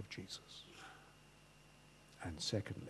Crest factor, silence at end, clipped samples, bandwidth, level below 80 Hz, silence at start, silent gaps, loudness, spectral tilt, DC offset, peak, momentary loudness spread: 24 dB; 0 s; under 0.1%; 12.5 kHz; -68 dBFS; 0 s; none; -46 LUFS; -4 dB/octave; under 0.1%; -26 dBFS; 23 LU